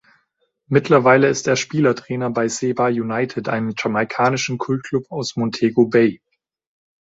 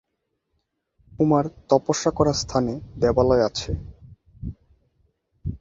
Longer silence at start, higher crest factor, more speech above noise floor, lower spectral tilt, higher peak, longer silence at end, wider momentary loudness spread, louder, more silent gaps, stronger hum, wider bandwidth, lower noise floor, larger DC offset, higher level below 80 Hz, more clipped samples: second, 0.7 s vs 1.15 s; about the same, 18 dB vs 22 dB; second, 50 dB vs 55 dB; about the same, -5.5 dB/octave vs -5.5 dB/octave; about the same, -2 dBFS vs -4 dBFS; first, 0.85 s vs 0.05 s; second, 9 LU vs 18 LU; first, -19 LUFS vs -22 LUFS; neither; neither; about the same, 8 kHz vs 7.8 kHz; second, -68 dBFS vs -76 dBFS; neither; second, -60 dBFS vs -42 dBFS; neither